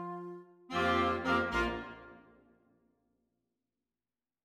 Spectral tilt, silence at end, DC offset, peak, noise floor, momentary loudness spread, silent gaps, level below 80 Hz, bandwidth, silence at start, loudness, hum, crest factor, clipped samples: -5.5 dB/octave; 2.25 s; under 0.1%; -18 dBFS; under -90 dBFS; 19 LU; none; -54 dBFS; 16 kHz; 0 s; -33 LUFS; none; 18 dB; under 0.1%